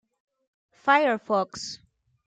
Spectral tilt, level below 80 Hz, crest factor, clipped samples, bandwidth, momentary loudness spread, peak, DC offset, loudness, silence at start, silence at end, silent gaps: -3.5 dB/octave; -70 dBFS; 20 dB; under 0.1%; 9.2 kHz; 16 LU; -8 dBFS; under 0.1%; -24 LUFS; 0.85 s; 0.5 s; none